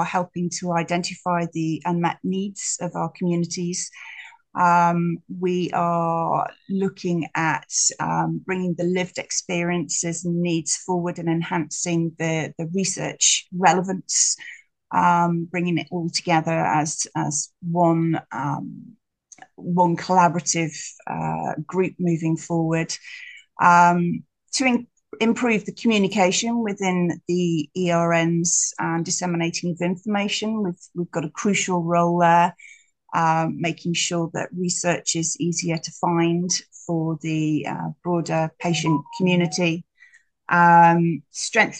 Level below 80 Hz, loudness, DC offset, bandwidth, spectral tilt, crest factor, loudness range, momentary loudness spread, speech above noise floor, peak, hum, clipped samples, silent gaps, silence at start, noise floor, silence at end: -66 dBFS; -22 LUFS; under 0.1%; 10 kHz; -4 dB/octave; 20 dB; 4 LU; 9 LU; 33 dB; -2 dBFS; none; under 0.1%; none; 0 s; -55 dBFS; 0 s